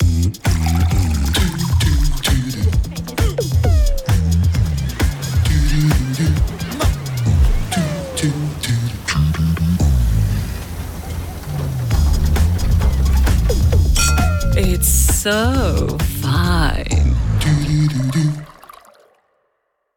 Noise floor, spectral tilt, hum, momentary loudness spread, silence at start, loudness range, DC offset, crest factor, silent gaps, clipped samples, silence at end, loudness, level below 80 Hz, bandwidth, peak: -69 dBFS; -5 dB/octave; none; 6 LU; 0 s; 4 LU; under 0.1%; 12 dB; none; under 0.1%; 1.5 s; -17 LUFS; -20 dBFS; 18 kHz; -4 dBFS